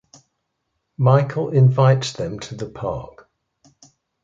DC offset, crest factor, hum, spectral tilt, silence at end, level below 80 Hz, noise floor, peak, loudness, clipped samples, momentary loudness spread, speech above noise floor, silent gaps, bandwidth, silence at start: under 0.1%; 18 dB; none; -7 dB/octave; 1.15 s; -52 dBFS; -75 dBFS; -2 dBFS; -19 LUFS; under 0.1%; 16 LU; 57 dB; none; 7.6 kHz; 1 s